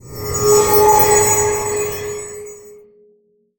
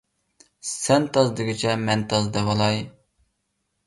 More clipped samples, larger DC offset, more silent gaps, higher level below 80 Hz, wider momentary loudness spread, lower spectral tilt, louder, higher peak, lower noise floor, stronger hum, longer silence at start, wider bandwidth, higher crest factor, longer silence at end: neither; neither; neither; first, -40 dBFS vs -54 dBFS; first, 19 LU vs 10 LU; second, -3 dB/octave vs -4.5 dB/octave; first, -13 LUFS vs -22 LUFS; first, 0 dBFS vs -6 dBFS; second, -57 dBFS vs -75 dBFS; neither; second, 0.05 s vs 0.65 s; first, over 20 kHz vs 11.5 kHz; about the same, 16 dB vs 18 dB; about the same, 0.85 s vs 0.95 s